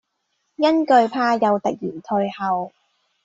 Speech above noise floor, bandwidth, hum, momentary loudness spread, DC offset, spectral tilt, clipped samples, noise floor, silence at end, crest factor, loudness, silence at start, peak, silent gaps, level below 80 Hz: 53 dB; 8 kHz; none; 10 LU; under 0.1%; -6 dB/octave; under 0.1%; -73 dBFS; 0.55 s; 18 dB; -20 LUFS; 0.6 s; -4 dBFS; none; -66 dBFS